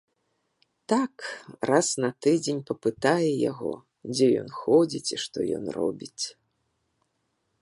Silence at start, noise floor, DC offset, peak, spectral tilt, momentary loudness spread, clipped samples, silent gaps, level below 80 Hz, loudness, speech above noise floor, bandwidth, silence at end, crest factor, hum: 0.9 s; -76 dBFS; under 0.1%; -6 dBFS; -4.5 dB/octave; 11 LU; under 0.1%; none; -70 dBFS; -26 LUFS; 50 dB; 11.5 kHz; 1.3 s; 20 dB; none